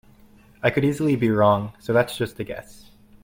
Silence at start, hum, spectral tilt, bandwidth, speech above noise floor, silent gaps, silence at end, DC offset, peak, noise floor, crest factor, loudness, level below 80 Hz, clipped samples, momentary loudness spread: 0.65 s; none; -7 dB/octave; 16.5 kHz; 30 dB; none; 0.5 s; under 0.1%; -6 dBFS; -52 dBFS; 18 dB; -22 LUFS; -54 dBFS; under 0.1%; 14 LU